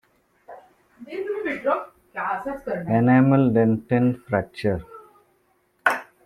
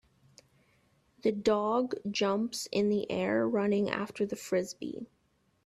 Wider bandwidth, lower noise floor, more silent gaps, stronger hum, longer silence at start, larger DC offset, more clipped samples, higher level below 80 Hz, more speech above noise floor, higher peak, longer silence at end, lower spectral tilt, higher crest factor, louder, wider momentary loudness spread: about the same, 13 kHz vs 14 kHz; second, -65 dBFS vs -69 dBFS; neither; neither; second, 0.5 s vs 1.25 s; neither; neither; first, -56 dBFS vs -70 dBFS; first, 44 dB vs 38 dB; first, -2 dBFS vs -12 dBFS; second, 0.25 s vs 0.6 s; first, -8.5 dB/octave vs -5 dB/octave; about the same, 22 dB vs 22 dB; first, -22 LUFS vs -31 LUFS; first, 13 LU vs 10 LU